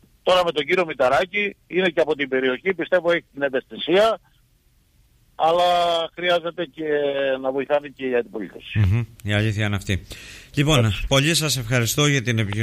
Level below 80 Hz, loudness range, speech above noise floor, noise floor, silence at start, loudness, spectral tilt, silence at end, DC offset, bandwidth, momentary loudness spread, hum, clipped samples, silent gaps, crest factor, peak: -44 dBFS; 3 LU; 39 dB; -60 dBFS; 0.25 s; -21 LUFS; -4.5 dB/octave; 0 s; under 0.1%; 15.5 kHz; 8 LU; none; under 0.1%; none; 18 dB; -4 dBFS